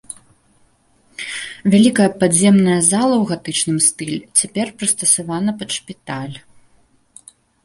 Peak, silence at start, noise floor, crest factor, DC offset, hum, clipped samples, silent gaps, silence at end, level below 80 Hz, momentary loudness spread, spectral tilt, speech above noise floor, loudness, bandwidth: 0 dBFS; 1.2 s; -56 dBFS; 18 dB; under 0.1%; none; under 0.1%; none; 1.25 s; -56 dBFS; 15 LU; -4 dB/octave; 40 dB; -16 LUFS; 11.5 kHz